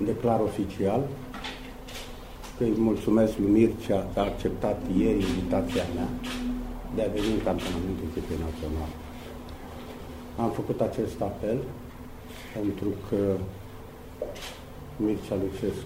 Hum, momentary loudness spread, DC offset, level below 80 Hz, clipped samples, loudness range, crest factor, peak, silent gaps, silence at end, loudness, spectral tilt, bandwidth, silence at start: none; 17 LU; under 0.1%; -42 dBFS; under 0.1%; 7 LU; 20 dB; -10 dBFS; none; 0 s; -29 LUFS; -7 dB/octave; 16 kHz; 0 s